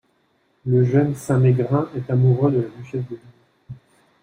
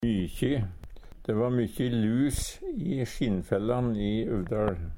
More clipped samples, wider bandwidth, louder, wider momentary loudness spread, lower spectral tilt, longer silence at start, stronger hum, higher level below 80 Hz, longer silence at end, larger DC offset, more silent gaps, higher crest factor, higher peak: neither; second, 10 kHz vs 17 kHz; first, -20 LUFS vs -29 LUFS; first, 13 LU vs 7 LU; first, -9.5 dB/octave vs -6.5 dB/octave; first, 0.65 s vs 0 s; neither; second, -58 dBFS vs -42 dBFS; first, 0.5 s vs 0 s; neither; neither; about the same, 16 dB vs 18 dB; first, -6 dBFS vs -10 dBFS